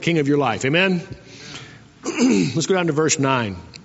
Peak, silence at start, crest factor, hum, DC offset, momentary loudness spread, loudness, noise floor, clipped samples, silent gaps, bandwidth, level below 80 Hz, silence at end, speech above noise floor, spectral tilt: -2 dBFS; 0 s; 18 dB; none; under 0.1%; 18 LU; -19 LUFS; -40 dBFS; under 0.1%; none; 8 kHz; -56 dBFS; 0 s; 21 dB; -4.5 dB/octave